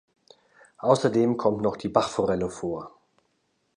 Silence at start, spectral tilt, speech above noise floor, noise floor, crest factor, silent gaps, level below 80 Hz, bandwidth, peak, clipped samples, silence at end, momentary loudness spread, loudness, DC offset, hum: 0.8 s; -6 dB/octave; 48 dB; -72 dBFS; 22 dB; none; -58 dBFS; 11 kHz; -6 dBFS; under 0.1%; 0.9 s; 11 LU; -25 LUFS; under 0.1%; none